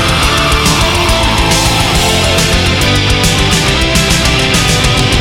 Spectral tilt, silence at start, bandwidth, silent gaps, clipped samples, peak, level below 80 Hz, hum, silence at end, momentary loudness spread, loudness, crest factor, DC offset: -3.5 dB/octave; 0 s; 17.5 kHz; none; under 0.1%; 0 dBFS; -18 dBFS; none; 0 s; 1 LU; -9 LUFS; 10 dB; under 0.1%